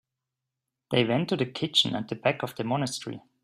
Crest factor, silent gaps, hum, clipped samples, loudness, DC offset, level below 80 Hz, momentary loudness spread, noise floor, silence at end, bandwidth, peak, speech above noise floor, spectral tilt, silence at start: 22 dB; none; none; under 0.1%; -27 LUFS; under 0.1%; -66 dBFS; 9 LU; -86 dBFS; 0.25 s; 16 kHz; -8 dBFS; 59 dB; -4.5 dB/octave; 0.9 s